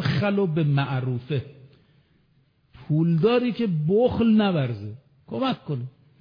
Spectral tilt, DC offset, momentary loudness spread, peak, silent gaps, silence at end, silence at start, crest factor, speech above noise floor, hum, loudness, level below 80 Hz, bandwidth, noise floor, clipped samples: -9.5 dB/octave; under 0.1%; 14 LU; -8 dBFS; none; 0.3 s; 0 s; 16 dB; 41 dB; none; -23 LUFS; -56 dBFS; 5.2 kHz; -63 dBFS; under 0.1%